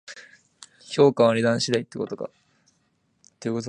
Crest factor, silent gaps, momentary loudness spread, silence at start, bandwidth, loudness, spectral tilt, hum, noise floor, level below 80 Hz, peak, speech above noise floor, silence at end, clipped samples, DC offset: 20 dB; none; 20 LU; 0.1 s; 11 kHz; -22 LUFS; -5 dB/octave; none; -69 dBFS; -68 dBFS; -4 dBFS; 47 dB; 0 s; under 0.1%; under 0.1%